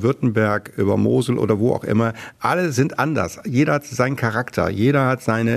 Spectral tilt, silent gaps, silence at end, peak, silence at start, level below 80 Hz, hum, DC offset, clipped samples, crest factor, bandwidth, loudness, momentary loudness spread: -7 dB/octave; none; 0 s; -2 dBFS; 0 s; -52 dBFS; none; under 0.1%; under 0.1%; 16 dB; 14 kHz; -20 LUFS; 4 LU